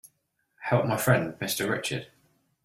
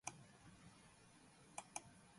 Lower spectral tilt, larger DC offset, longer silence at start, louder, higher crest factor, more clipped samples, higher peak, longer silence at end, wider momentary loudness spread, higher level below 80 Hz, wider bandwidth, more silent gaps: first, -5 dB/octave vs -2.5 dB/octave; neither; first, 0.6 s vs 0.05 s; first, -27 LUFS vs -58 LUFS; second, 22 dB vs 30 dB; neither; first, -8 dBFS vs -30 dBFS; first, 0.6 s vs 0 s; second, 10 LU vs 14 LU; first, -64 dBFS vs -80 dBFS; first, 16 kHz vs 11.5 kHz; neither